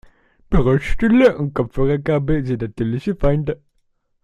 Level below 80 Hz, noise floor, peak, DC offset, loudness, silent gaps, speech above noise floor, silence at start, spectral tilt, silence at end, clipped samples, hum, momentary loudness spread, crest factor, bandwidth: -30 dBFS; -65 dBFS; -2 dBFS; under 0.1%; -19 LUFS; none; 48 dB; 0.5 s; -8.5 dB/octave; 0.7 s; under 0.1%; none; 9 LU; 16 dB; 9.8 kHz